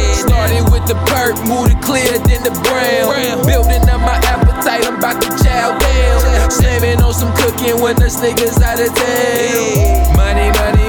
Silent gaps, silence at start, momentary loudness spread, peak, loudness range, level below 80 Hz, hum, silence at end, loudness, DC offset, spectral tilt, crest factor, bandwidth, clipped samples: none; 0 s; 2 LU; -2 dBFS; 0 LU; -16 dBFS; none; 0 s; -12 LUFS; under 0.1%; -5 dB/octave; 10 dB; 19.5 kHz; under 0.1%